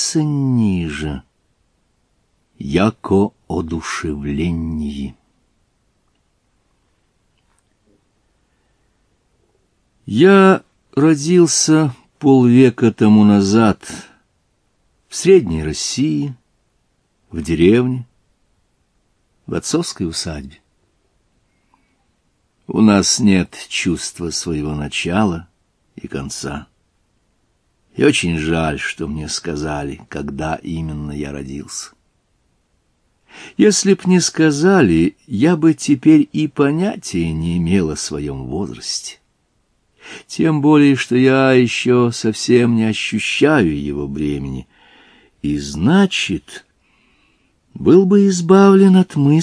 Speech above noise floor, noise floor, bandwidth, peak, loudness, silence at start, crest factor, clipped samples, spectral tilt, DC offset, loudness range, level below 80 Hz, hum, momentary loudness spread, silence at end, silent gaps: 49 dB; -64 dBFS; 11 kHz; 0 dBFS; -15 LUFS; 0 s; 16 dB; under 0.1%; -5.5 dB/octave; under 0.1%; 12 LU; -42 dBFS; none; 16 LU; 0 s; none